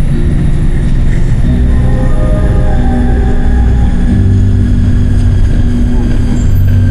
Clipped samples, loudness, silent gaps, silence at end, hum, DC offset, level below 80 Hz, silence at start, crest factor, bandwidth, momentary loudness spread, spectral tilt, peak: under 0.1%; -11 LUFS; none; 0 s; none; under 0.1%; -10 dBFS; 0 s; 6 dB; 10.5 kHz; 3 LU; -8.5 dB/octave; 0 dBFS